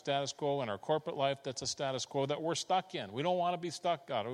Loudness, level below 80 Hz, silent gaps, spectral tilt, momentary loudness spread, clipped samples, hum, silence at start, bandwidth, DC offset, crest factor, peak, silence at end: -35 LUFS; -78 dBFS; none; -4 dB/octave; 4 LU; under 0.1%; none; 0.05 s; 12.5 kHz; under 0.1%; 16 dB; -18 dBFS; 0 s